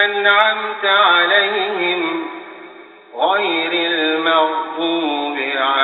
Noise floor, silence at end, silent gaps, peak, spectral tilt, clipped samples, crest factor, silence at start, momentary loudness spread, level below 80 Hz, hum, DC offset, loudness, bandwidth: -40 dBFS; 0 s; none; 0 dBFS; 1.5 dB/octave; under 0.1%; 16 dB; 0 s; 10 LU; -74 dBFS; none; under 0.1%; -16 LUFS; 4.4 kHz